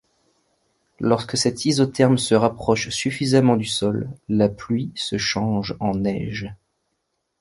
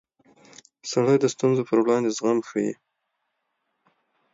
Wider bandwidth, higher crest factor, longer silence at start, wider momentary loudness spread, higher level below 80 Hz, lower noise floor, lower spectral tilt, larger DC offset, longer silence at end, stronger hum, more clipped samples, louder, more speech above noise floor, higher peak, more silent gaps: first, 11.5 kHz vs 7.8 kHz; about the same, 20 dB vs 16 dB; first, 1 s vs 0.85 s; about the same, 8 LU vs 9 LU; first, -50 dBFS vs -72 dBFS; about the same, -75 dBFS vs -77 dBFS; about the same, -5 dB/octave vs -5.5 dB/octave; neither; second, 0.85 s vs 1.6 s; neither; neither; about the same, -21 LUFS vs -23 LUFS; about the same, 54 dB vs 55 dB; first, -2 dBFS vs -8 dBFS; neither